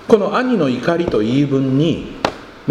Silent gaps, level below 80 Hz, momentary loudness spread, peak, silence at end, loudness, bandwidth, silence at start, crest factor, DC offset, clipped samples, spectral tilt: none; -44 dBFS; 8 LU; 0 dBFS; 0 s; -17 LUFS; 11.5 kHz; 0 s; 16 dB; under 0.1%; under 0.1%; -7 dB/octave